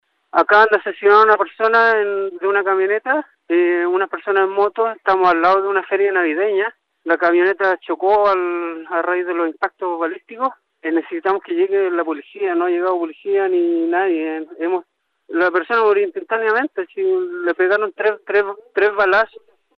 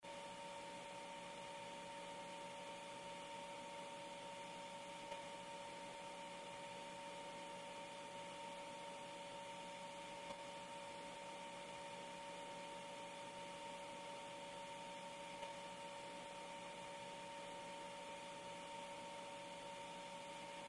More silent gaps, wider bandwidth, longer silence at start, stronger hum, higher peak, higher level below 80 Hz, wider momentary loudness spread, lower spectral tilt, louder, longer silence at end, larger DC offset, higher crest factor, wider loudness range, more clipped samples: neither; second, 6 kHz vs 11.5 kHz; first, 0.35 s vs 0 s; neither; first, -2 dBFS vs -36 dBFS; first, -64 dBFS vs -82 dBFS; first, 9 LU vs 1 LU; first, -6 dB/octave vs -2.5 dB/octave; first, -17 LUFS vs -52 LUFS; first, 0.5 s vs 0 s; neither; about the same, 16 dB vs 16 dB; first, 5 LU vs 0 LU; neither